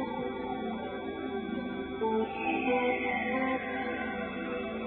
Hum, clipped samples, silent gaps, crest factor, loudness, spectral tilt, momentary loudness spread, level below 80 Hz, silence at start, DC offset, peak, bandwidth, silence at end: none; under 0.1%; none; 16 dB; -33 LUFS; -9 dB/octave; 8 LU; -58 dBFS; 0 s; under 0.1%; -18 dBFS; 4.4 kHz; 0 s